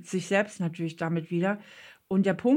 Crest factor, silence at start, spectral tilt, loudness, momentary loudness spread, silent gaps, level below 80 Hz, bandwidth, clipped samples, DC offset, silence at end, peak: 16 dB; 0 s; -6.5 dB/octave; -29 LUFS; 6 LU; none; -72 dBFS; 11.5 kHz; under 0.1%; under 0.1%; 0 s; -12 dBFS